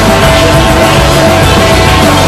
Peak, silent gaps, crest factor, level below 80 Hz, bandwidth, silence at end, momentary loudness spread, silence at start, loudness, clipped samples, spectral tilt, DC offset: 0 dBFS; none; 6 dB; -16 dBFS; 16 kHz; 0 s; 0 LU; 0 s; -5 LUFS; 4%; -4.5 dB/octave; under 0.1%